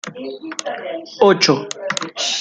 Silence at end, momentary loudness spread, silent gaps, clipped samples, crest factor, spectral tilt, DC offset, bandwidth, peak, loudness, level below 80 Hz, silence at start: 0 s; 16 LU; none; under 0.1%; 20 dB; -3 dB/octave; under 0.1%; 9.4 kHz; 0 dBFS; -18 LUFS; -66 dBFS; 0.05 s